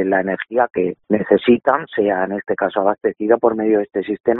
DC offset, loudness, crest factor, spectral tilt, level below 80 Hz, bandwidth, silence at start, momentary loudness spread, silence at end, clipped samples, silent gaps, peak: under 0.1%; -18 LUFS; 18 dB; -5 dB/octave; -58 dBFS; 4.1 kHz; 0 s; 6 LU; 0 s; under 0.1%; 4.20-4.24 s; 0 dBFS